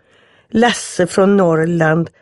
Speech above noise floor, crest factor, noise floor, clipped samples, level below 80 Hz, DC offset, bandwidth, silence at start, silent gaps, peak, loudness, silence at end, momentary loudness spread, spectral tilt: 38 dB; 14 dB; -52 dBFS; under 0.1%; -52 dBFS; under 0.1%; 11.5 kHz; 0.55 s; none; -2 dBFS; -14 LUFS; 0.15 s; 5 LU; -5.5 dB/octave